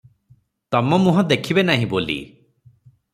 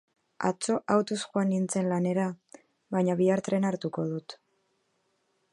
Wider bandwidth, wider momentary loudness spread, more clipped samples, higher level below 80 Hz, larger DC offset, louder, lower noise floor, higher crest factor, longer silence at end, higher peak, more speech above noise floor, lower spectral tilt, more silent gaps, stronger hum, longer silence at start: first, 14.5 kHz vs 11.5 kHz; about the same, 8 LU vs 8 LU; neither; first, -56 dBFS vs -74 dBFS; neither; first, -19 LUFS vs -29 LUFS; second, -57 dBFS vs -74 dBFS; about the same, 18 dB vs 20 dB; second, 0.85 s vs 1.15 s; first, -2 dBFS vs -10 dBFS; second, 39 dB vs 47 dB; about the same, -6.5 dB/octave vs -6 dB/octave; neither; neither; first, 0.7 s vs 0.4 s